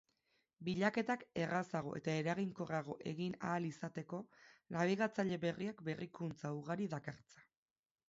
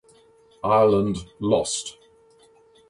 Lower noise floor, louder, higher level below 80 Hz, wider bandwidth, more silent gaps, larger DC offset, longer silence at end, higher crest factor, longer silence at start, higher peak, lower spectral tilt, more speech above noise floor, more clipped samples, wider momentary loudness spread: first, under -90 dBFS vs -56 dBFS; second, -41 LUFS vs -22 LUFS; second, -76 dBFS vs -52 dBFS; second, 7.6 kHz vs 11.5 kHz; neither; neither; second, 0.65 s vs 1 s; about the same, 18 dB vs 18 dB; about the same, 0.6 s vs 0.65 s; second, -22 dBFS vs -6 dBFS; about the same, -5.5 dB/octave vs -5 dB/octave; first, over 49 dB vs 35 dB; neither; about the same, 11 LU vs 12 LU